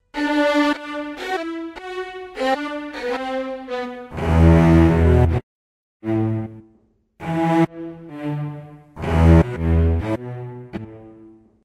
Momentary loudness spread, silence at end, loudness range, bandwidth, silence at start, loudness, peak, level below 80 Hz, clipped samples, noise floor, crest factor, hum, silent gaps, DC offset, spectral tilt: 19 LU; 0.35 s; 7 LU; 9.8 kHz; 0.15 s; -20 LUFS; -2 dBFS; -28 dBFS; under 0.1%; -59 dBFS; 18 dB; none; 5.43-6.00 s; under 0.1%; -8 dB/octave